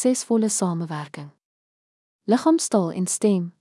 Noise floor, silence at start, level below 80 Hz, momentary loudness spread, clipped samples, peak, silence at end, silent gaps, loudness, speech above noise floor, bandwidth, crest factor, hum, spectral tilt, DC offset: under -90 dBFS; 0 s; -82 dBFS; 15 LU; under 0.1%; -8 dBFS; 0.1 s; 1.45-2.19 s; -22 LUFS; over 68 dB; 12 kHz; 16 dB; none; -5 dB/octave; under 0.1%